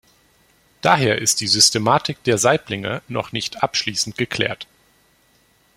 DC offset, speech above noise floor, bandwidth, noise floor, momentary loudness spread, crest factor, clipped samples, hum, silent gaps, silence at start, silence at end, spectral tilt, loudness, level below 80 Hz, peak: under 0.1%; 39 dB; 16.5 kHz; -58 dBFS; 12 LU; 22 dB; under 0.1%; none; none; 0.85 s; 1.15 s; -2.5 dB/octave; -18 LUFS; -56 dBFS; 0 dBFS